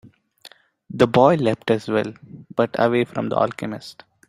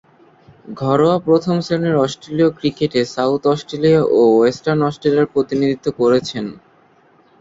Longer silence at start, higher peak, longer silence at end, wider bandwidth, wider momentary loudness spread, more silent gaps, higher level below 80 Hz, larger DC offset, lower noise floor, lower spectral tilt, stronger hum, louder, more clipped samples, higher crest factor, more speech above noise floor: first, 0.9 s vs 0.65 s; about the same, -2 dBFS vs -2 dBFS; second, 0.4 s vs 0.85 s; first, 14 kHz vs 7.8 kHz; first, 16 LU vs 7 LU; neither; about the same, -58 dBFS vs -54 dBFS; neither; about the same, -49 dBFS vs -52 dBFS; about the same, -7 dB/octave vs -7 dB/octave; neither; second, -20 LUFS vs -16 LUFS; neither; first, 20 dB vs 14 dB; second, 30 dB vs 37 dB